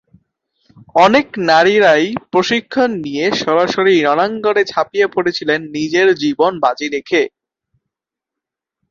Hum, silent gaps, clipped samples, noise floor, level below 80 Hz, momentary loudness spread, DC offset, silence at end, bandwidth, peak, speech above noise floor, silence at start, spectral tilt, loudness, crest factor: none; none; under 0.1%; -84 dBFS; -58 dBFS; 7 LU; under 0.1%; 1.65 s; 7.6 kHz; 0 dBFS; 70 dB; 0.95 s; -4.5 dB/octave; -14 LUFS; 14 dB